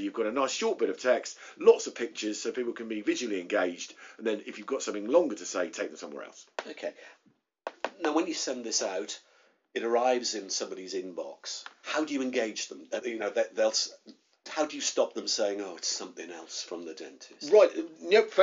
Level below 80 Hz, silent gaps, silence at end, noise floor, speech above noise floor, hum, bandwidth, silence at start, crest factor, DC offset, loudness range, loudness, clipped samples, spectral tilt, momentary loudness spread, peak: -84 dBFS; none; 0 s; -65 dBFS; 35 dB; none; 7.4 kHz; 0 s; 22 dB; under 0.1%; 5 LU; -30 LUFS; under 0.1%; -1 dB/octave; 16 LU; -8 dBFS